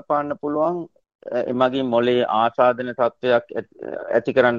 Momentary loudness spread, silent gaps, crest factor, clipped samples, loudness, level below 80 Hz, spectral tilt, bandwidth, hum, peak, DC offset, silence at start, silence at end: 14 LU; 1.15-1.19 s; 18 dB; under 0.1%; -21 LUFS; -64 dBFS; -7.5 dB/octave; 7 kHz; none; -2 dBFS; under 0.1%; 0.1 s; 0 s